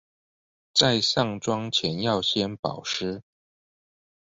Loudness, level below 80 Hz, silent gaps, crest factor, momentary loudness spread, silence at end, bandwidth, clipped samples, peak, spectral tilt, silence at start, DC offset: -24 LUFS; -60 dBFS; 2.59-2.63 s; 28 dB; 10 LU; 1 s; 8.2 kHz; under 0.1%; 0 dBFS; -4 dB/octave; 0.75 s; under 0.1%